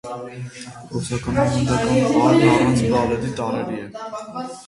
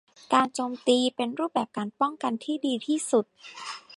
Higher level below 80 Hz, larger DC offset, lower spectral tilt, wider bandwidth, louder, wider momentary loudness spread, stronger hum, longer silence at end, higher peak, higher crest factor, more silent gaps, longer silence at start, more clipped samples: first, -42 dBFS vs -80 dBFS; neither; first, -6 dB/octave vs -3.5 dB/octave; about the same, 11.5 kHz vs 11.5 kHz; first, -19 LUFS vs -27 LUFS; first, 18 LU vs 12 LU; neither; about the same, 0.05 s vs 0.05 s; first, -2 dBFS vs -8 dBFS; about the same, 18 dB vs 20 dB; neither; second, 0.05 s vs 0.3 s; neither